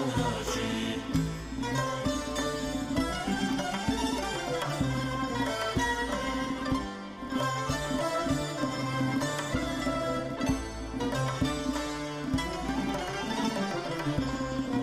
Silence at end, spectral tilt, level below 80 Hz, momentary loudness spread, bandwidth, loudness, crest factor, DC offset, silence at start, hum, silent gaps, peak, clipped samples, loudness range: 0 s; -5 dB/octave; -44 dBFS; 3 LU; 16 kHz; -31 LUFS; 14 dB; under 0.1%; 0 s; none; none; -16 dBFS; under 0.1%; 1 LU